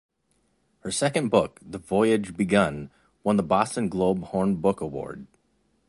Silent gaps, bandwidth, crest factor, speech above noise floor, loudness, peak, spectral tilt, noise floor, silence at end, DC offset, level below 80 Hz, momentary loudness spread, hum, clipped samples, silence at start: none; 11.5 kHz; 20 dB; 46 dB; -25 LUFS; -6 dBFS; -5.5 dB/octave; -70 dBFS; 0.65 s; under 0.1%; -54 dBFS; 16 LU; none; under 0.1%; 0.85 s